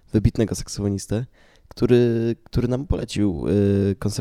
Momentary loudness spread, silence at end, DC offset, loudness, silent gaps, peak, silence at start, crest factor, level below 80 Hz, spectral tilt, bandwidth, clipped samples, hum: 8 LU; 0 s; under 0.1%; -22 LUFS; none; -2 dBFS; 0.15 s; 18 dB; -36 dBFS; -7 dB/octave; 14.5 kHz; under 0.1%; none